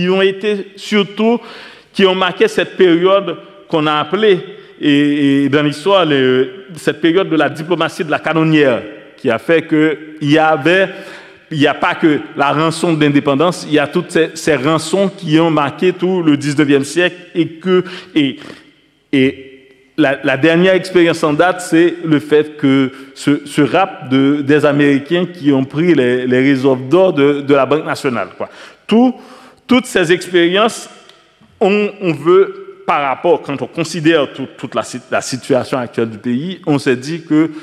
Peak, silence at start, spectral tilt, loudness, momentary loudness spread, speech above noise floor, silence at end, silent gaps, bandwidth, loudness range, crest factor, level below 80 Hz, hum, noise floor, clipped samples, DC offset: 0 dBFS; 0 s; -5.5 dB/octave; -14 LUFS; 9 LU; 37 dB; 0 s; none; 13.5 kHz; 3 LU; 14 dB; -58 dBFS; none; -50 dBFS; under 0.1%; under 0.1%